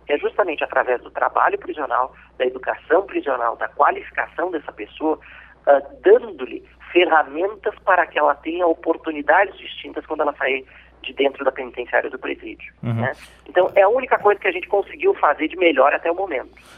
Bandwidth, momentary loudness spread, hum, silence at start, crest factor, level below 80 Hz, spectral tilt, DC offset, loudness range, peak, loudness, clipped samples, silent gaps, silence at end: 9 kHz; 13 LU; none; 0.1 s; 18 dB; -54 dBFS; -7 dB/octave; under 0.1%; 5 LU; -2 dBFS; -20 LUFS; under 0.1%; none; 0.35 s